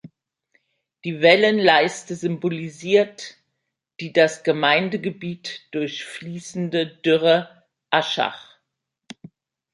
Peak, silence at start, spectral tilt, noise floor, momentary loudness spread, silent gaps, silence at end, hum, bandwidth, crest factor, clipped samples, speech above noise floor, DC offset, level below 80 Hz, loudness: 0 dBFS; 0.05 s; -4.5 dB/octave; -80 dBFS; 17 LU; none; 1.3 s; none; 11.5 kHz; 22 dB; under 0.1%; 59 dB; under 0.1%; -72 dBFS; -20 LUFS